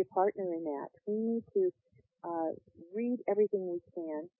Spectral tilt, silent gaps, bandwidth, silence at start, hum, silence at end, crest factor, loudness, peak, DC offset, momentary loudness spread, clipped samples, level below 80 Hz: -4 dB/octave; none; 2.8 kHz; 0 s; none; 0.1 s; 18 dB; -35 LUFS; -18 dBFS; under 0.1%; 10 LU; under 0.1%; -82 dBFS